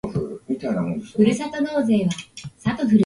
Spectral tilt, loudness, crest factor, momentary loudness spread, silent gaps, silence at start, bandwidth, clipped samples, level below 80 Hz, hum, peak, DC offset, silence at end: -6.5 dB/octave; -23 LUFS; 16 dB; 9 LU; none; 0.05 s; 11.5 kHz; under 0.1%; -52 dBFS; none; -6 dBFS; under 0.1%; 0 s